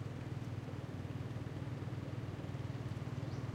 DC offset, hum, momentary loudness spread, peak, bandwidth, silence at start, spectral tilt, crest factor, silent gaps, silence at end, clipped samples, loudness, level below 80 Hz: under 0.1%; none; 2 LU; -30 dBFS; 13 kHz; 0 s; -7.5 dB/octave; 12 dB; none; 0 s; under 0.1%; -44 LUFS; -62 dBFS